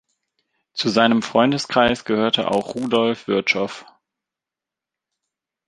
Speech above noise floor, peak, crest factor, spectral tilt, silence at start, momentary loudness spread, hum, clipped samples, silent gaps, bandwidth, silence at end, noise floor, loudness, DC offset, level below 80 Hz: 68 dB; -2 dBFS; 20 dB; -4.5 dB/octave; 0.75 s; 7 LU; none; under 0.1%; none; 11 kHz; 1.85 s; -88 dBFS; -19 LUFS; under 0.1%; -56 dBFS